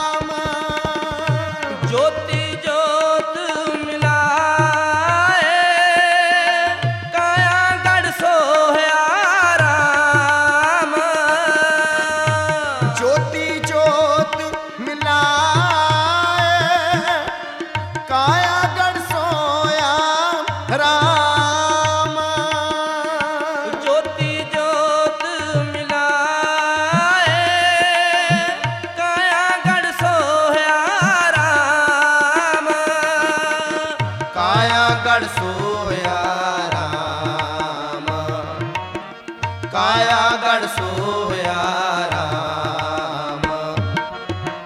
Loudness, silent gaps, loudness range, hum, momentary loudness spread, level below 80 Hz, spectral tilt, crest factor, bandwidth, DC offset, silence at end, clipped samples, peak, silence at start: -17 LUFS; none; 5 LU; none; 9 LU; -50 dBFS; -3.5 dB/octave; 14 dB; 16 kHz; under 0.1%; 0 s; under 0.1%; -2 dBFS; 0 s